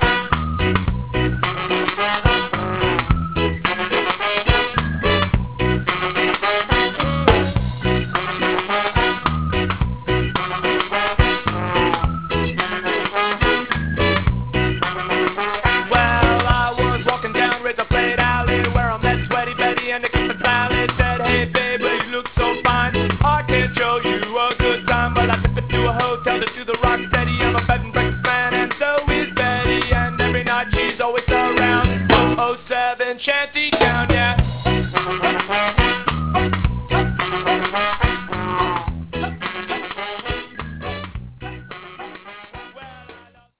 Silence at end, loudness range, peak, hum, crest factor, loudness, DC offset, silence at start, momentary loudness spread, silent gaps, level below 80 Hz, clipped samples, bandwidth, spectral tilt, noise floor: 0.15 s; 3 LU; 0 dBFS; none; 20 dB; -19 LUFS; 0.7%; 0 s; 7 LU; none; -28 dBFS; under 0.1%; 4 kHz; -9.5 dB/octave; -45 dBFS